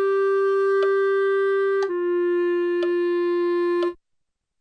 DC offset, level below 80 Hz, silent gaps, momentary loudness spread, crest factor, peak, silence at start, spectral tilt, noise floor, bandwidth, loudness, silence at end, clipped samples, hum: under 0.1%; -72 dBFS; none; 3 LU; 10 dB; -12 dBFS; 0 s; -5 dB/octave; -76 dBFS; 6.2 kHz; -22 LUFS; 0.65 s; under 0.1%; none